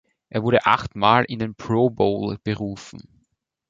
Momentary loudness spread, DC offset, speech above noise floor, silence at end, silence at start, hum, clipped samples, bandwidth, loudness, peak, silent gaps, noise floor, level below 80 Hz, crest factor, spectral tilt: 12 LU; under 0.1%; 51 dB; 0.7 s; 0.35 s; none; under 0.1%; 7.8 kHz; -21 LUFS; -2 dBFS; none; -72 dBFS; -50 dBFS; 20 dB; -6.5 dB/octave